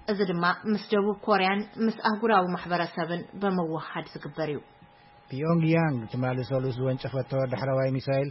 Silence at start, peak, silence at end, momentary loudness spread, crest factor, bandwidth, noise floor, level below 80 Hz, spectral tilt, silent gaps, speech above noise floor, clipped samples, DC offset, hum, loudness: 0.05 s; -10 dBFS; 0 s; 9 LU; 18 dB; 5.8 kHz; -54 dBFS; -62 dBFS; -10.5 dB/octave; none; 27 dB; under 0.1%; under 0.1%; none; -27 LUFS